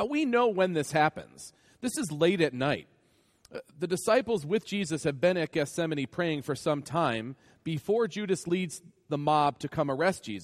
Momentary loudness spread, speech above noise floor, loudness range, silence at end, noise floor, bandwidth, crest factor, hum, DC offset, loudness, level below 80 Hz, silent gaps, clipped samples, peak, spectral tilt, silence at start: 13 LU; 38 dB; 2 LU; 0 s; -67 dBFS; 15 kHz; 18 dB; none; under 0.1%; -29 LUFS; -66 dBFS; none; under 0.1%; -10 dBFS; -5 dB/octave; 0 s